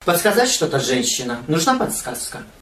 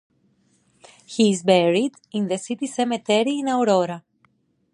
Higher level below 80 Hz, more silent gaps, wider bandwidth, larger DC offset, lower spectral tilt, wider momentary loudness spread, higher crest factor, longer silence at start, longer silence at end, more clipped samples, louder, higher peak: first, -50 dBFS vs -72 dBFS; neither; first, 15 kHz vs 11.5 kHz; neither; second, -3 dB/octave vs -5 dB/octave; about the same, 10 LU vs 10 LU; about the same, 18 dB vs 20 dB; second, 0 s vs 1.1 s; second, 0.1 s vs 0.75 s; neither; about the same, -19 LUFS vs -21 LUFS; about the same, -2 dBFS vs -2 dBFS